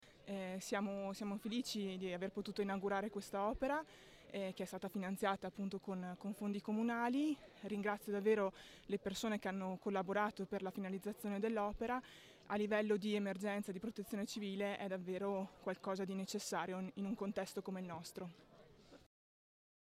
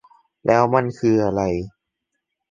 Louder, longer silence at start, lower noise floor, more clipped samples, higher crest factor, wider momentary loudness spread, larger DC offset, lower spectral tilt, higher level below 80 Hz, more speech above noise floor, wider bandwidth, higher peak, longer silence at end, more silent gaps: second, -42 LUFS vs -20 LUFS; second, 0 s vs 0.45 s; second, -63 dBFS vs -79 dBFS; neither; about the same, 18 dB vs 20 dB; about the same, 9 LU vs 11 LU; neither; second, -5.5 dB/octave vs -7.5 dB/octave; second, -70 dBFS vs -48 dBFS; second, 21 dB vs 60 dB; first, 16 kHz vs 7.6 kHz; second, -24 dBFS vs -2 dBFS; first, 1 s vs 0.8 s; neither